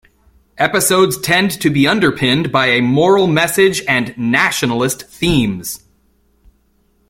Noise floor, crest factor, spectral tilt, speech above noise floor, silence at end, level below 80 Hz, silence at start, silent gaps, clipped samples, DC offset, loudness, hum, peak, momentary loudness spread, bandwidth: -58 dBFS; 14 dB; -4 dB/octave; 44 dB; 1.35 s; -42 dBFS; 0.6 s; none; under 0.1%; under 0.1%; -14 LUFS; none; 0 dBFS; 7 LU; 16.5 kHz